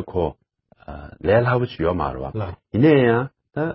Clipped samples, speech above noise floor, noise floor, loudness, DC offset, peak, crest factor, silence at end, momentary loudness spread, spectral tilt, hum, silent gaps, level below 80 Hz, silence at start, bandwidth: under 0.1%; 29 dB; -48 dBFS; -20 LUFS; under 0.1%; -4 dBFS; 16 dB; 0 s; 15 LU; -12 dB/octave; none; none; -40 dBFS; 0 s; 5.8 kHz